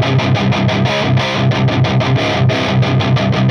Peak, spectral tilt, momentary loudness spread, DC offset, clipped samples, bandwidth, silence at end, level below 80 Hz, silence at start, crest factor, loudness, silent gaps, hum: -2 dBFS; -6.5 dB/octave; 1 LU; under 0.1%; under 0.1%; 6.8 kHz; 0 s; -38 dBFS; 0 s; 12 dB; -14 LUFS; none; none